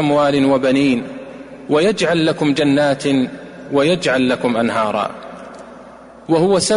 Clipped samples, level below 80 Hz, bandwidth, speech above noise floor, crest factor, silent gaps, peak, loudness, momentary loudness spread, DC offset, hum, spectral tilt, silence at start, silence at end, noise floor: under 0.1%; -52 dBFS; 11 kHz; 24 dB; 12 dB; none; -4 dBFS; -16 LUFS; 19 LU; under 0.1%; none; -5 dB/octave; 0 s; 0 s; -39 dBFS